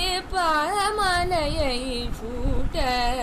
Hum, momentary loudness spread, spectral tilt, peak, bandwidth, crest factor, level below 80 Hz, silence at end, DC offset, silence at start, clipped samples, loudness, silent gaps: none; 8 LU; -4 dB/octave; -10 dBFS; 15.5 kHz; 12 dB; -30 dBFS; 0 s; under 0.1%; 0 s; under 0.1%; -24 LUFS; none